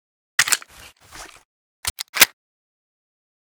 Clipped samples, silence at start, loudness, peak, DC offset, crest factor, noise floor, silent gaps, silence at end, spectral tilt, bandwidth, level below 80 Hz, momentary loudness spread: under 0.1%; 0.4 s; -19 LUFS; 0 dBFS; under 0.1%; 26 dB; -47 dBFS; 1.45-1.83 s, 1.90-1.96 s, 2.09-2.13 s; 1.15 s; 1.5 dB/octave; over 20 kHz; -54 dBFS; 25 LU